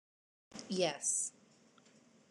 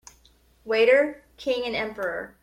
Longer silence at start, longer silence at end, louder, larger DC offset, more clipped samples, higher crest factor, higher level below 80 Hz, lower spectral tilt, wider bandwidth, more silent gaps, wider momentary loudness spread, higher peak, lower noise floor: about the same, 0.55 s vs 0.65 s; first, 1 s vs 0.15 s; second, -36 LUFS vs -24 LUFS; neither; neither; about the same, 22 dB vs 18 dB; second, -88 dBFS vs -60 dBFS; second, -2.5 dB/octave vs -4 dB/octave; about the same, 12.5 kHz vs 13.5 kHz; neither; first, 19 LU vs 12 LU; second, -20 dBFS vs -8 dBFS; first, -66 dBFS vs -59 dBFS